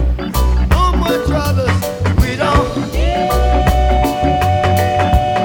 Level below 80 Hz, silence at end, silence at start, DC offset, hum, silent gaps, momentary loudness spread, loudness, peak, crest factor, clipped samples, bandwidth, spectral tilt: -18 dBFS; 0 s; 0 s; under 0.1%; none; none; 3 LU; -15 LUFS; 0 dBFS; 12 dB; under 0.1%; 19.5 kHz; -6 dB/octave